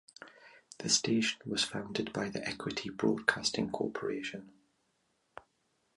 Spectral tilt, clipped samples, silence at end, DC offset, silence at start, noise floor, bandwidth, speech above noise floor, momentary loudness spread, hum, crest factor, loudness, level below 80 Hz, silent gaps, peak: -3 dB/octave; under 0.1%; 0.55 s; under 0.1%; 0.2 s; -77 dBFS; 11.5 kHz; 43 dB; 18 LU; none; 26 dB; -33 LUFS; -68 dBFS; none; -10 dBFS